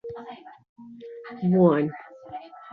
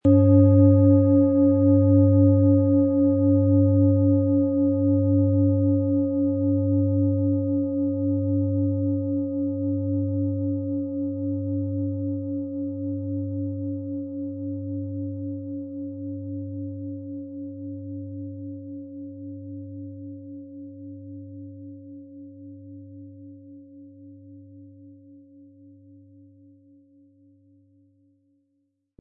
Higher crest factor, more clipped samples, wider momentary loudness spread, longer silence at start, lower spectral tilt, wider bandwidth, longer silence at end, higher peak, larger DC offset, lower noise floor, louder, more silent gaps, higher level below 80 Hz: about the same, 20 dB vs 18 dB; neither; about the same, 23 LU vs 23 LU; about the same, 0.05 s vs 0.05 s; second, -11.5 dB/octave vs -15.5 dB/octave; first, 4.6 kHz vs 1.8 kHz; second, 0 s vs 4.05 s; about the same, -6 dBFS vs -6 dBFS; neither; second, -42 dBFS vs -73 dBFS; about the same, -22 LUFS vs -22 LUFS; first, 0.69-0.76 s vs none; second, -68 dBFS vs -60 dBFS